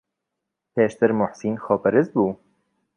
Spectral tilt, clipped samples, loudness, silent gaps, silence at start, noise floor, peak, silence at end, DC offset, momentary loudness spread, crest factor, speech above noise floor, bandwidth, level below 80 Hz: -8 dB/octave; under 0.1%; -22 LUFS; none; 0.75 s; -82 dBFS; -2 dBFS; 0.6 s; under 0.1%; 9 LU; 20 dB; 61 dB; 10.5 kHz; -62 dBFS